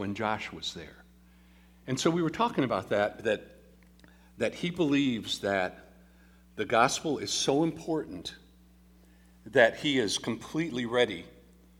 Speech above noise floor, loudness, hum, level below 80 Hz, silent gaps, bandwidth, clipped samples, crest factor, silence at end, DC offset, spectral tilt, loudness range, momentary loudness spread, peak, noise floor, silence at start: 29 dB; -29 LUFS; none; -60 dBFS; none; 16.5 kHz; under 0.1%; 24 dB; 0.5 s; under 0.1%; -4 dB/octave; 2 LU; 13 LU; -8 dBFS; -58 dBFS; 0 s